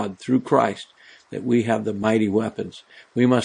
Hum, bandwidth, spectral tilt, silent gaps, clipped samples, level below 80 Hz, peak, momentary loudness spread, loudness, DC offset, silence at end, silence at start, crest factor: none; 10 kHz; -6.5 dB/octave; none; under 0.1%; -66 dBFS; -2 dBFS; 16 LU; -22 LUFS; under 0.1%; 0 s; 0 s; 20 dB